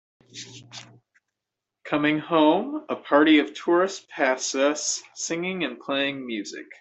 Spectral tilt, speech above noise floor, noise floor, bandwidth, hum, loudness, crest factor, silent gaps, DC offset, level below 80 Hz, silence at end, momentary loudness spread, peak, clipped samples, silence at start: -3 dB/octave; 62 dB; -86 dBFS; 8.4 kHz; none; -23 LUFS; 20 dB; none; under 0.1%; -74 dBFS; 0.1 s; 20 LU; -6 dBFS; under 0.1%; 0.35 s